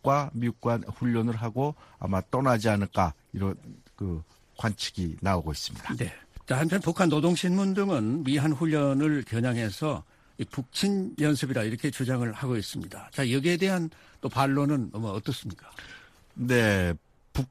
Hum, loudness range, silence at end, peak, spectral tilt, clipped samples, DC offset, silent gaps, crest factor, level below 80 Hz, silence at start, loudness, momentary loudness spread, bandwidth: none; 4 LU; 0.05 s; -8 dBFS; -6 dB/octave; under 0.1%; under 0.1%; none; 20 dB; -50 dBFS; 0.05 s; -28 LUFS; 13 LU; 15 kHz